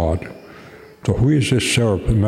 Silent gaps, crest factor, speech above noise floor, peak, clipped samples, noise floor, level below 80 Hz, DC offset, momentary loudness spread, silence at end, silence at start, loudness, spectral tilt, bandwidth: none; 14 dB; 25 dB; -4 dBFS; under 0.1%; -41 dBFS; -32 dBFS; under 0.1%; 15 LU; 0 s; 0 s; -18 LUFS; -5.5 dB/octave; 14.5 kHz